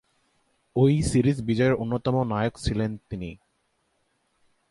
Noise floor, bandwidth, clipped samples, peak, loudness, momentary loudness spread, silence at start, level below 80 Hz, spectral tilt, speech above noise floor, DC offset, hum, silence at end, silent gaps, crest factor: -72 dBFS; 11.5 kHz; under 0.1%; -8 dBFS; -25 LUFS; 14 LU; 0.75 s; -44 dBFS; -7 dB/octave; 48 dB; under 0.1%; none; 1.35 s; none; 18 dB